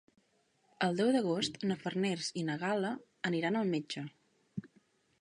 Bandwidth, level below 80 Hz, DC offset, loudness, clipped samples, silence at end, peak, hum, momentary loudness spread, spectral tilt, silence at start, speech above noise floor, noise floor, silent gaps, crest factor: 11.5 kHz; -76 dBFS; under 0.1%; -34 LUFS; under 0.1%; 0.55 s; -18 dBFS; none; 17 LU; -5 dB/octave; 0.8 s; 40 dB; -74 dBFS; none; 18 dB